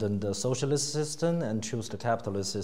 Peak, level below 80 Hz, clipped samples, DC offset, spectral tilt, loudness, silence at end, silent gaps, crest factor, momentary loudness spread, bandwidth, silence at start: -14 dBFS; -66 dBFS; under 0.1%; 0.6%; -5 dB/octave; -30 LUFS; 0 s; none; 16 dB; 5 LU; 16 kHz; 0 s